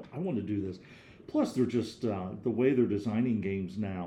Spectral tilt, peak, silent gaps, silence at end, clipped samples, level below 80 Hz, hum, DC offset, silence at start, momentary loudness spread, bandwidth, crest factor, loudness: -8 dB/octave; -14 dBFS; none; 0 s; under 0.1%; -66 dBFS; none; under 0.1%; 0 s; 8 LU; 11.5 kHz; 18 dB; -31 LUFS